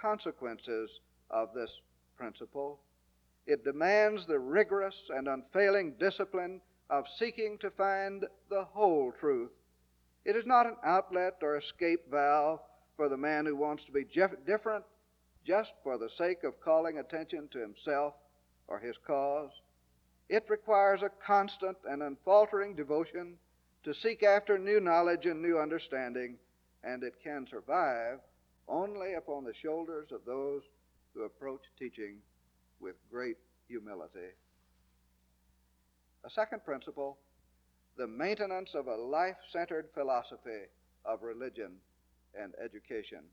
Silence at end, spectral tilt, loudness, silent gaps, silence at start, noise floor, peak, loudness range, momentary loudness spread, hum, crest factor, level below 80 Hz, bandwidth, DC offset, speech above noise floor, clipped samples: 0.1 s; -6 dB/octave; -34 LUFS; none; 0 s; -72 dBFS; -14 dBFS; 13 LU; 18 LU; none; 20 dB; -74 dBFS; 6.8 kHz; under 0.1%; 39 dB; under 0.1%